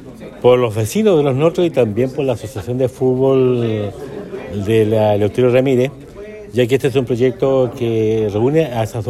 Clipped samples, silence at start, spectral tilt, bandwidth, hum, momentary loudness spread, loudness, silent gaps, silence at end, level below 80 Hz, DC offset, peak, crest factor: under 0.1%; 0 s; -7 dB/octave; 13.5 kHz; none; 11 LU; -16 LUFS; none; 0 s; -46 dBFS; under 0.1%; 0 dBFS; 14 dB